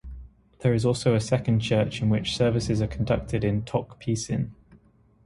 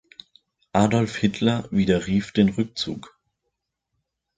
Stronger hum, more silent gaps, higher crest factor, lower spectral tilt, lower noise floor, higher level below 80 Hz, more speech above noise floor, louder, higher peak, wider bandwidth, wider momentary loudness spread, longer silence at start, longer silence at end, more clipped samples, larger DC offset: neither; neither; about the same, 16 dB vs 20 dB; about the same, -6.5 dB/octave vs -6.5 dB/octave; second, -58 dBFS vs -79 dBFS; first, -44 dBFS vs -50 dBFS; second, 34 dB vs 58 dB; second, -26 LUFS vs -23 LUFS; second, -8 dBFS vs -4 dBFS; first, 11.5 kHz vs 9.2 kHz; about the same, 7 LU vs 8 LU; second, 0.05 s vs 0.75 s; second, 0.5 s vs 1.3 s; neither; neither